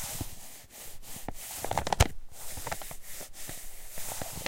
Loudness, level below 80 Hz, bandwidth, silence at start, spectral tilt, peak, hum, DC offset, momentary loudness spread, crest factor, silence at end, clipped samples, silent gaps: -36 LUFS; -42 dBFS; 17 kHz; 0 s; -3.5 dB/octave; -6 dBFS; none; under 0.1%; 17 LU; 28 dB; 0 s; under 0.1%; none